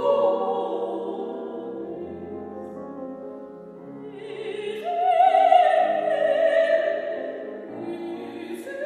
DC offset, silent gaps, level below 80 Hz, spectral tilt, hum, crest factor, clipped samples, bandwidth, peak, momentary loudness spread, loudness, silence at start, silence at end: under 0.1%; none; -70 dBFS; -5.5 dB/octave; none; 20 dB; under 0.1%; 12 kHz; -4 dBFS; 20 LU; -23 LUFS; 0 s; 0 s